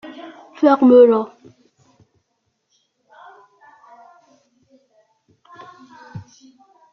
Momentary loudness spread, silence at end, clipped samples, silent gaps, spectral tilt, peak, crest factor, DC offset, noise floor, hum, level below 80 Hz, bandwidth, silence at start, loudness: 28 LU; 0.7 s; under 0.1%; none; -6 dB/octave; -2 dBFS; 20 dB; under 0.1%; -71 dBFS; none; -68 dBFS; 6.4 kHz; 0.05 s; -13 LUFS